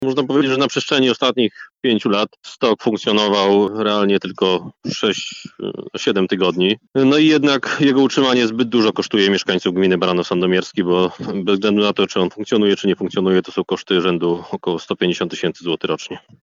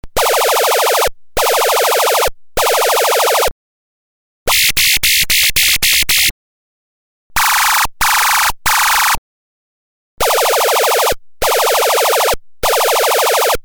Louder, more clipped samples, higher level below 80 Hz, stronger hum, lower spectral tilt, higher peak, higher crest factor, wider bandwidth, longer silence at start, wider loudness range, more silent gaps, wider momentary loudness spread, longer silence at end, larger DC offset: second, -17 LUFS vs -12 LUFS; neither; second, -64 dBFS vs -36 dBFS; neither; first, -5 dB/octave vs 0.5 dB/octave; about the same, -2 dBFS vs 0 dBFS; about the same, 16 dB vs 14 dB; second, 7.6 kHz vs over 20 kHz; about the same, 0 s vs 0.05 s; about the same, 4 LU vs 3 LU; second, none vs 3.51-4.46 s, 6.31-7.30 s, 9.18-10.18 s; about the same, 8 LU vs 7 LU; first, 0.25 s vs 0.05 s; neither